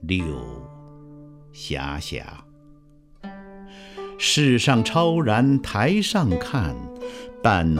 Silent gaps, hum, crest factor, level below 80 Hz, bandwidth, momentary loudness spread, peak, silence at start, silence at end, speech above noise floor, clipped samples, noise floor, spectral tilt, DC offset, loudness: none; none; 20 dB; -42 dBFS; 15.5 kHz; 22 LU; -4 dBFS; 0 s; 0 s; 30 dB; under 0.1%; -51 dBFS; -5 dB/octave; under 0.1%; -21 LUFS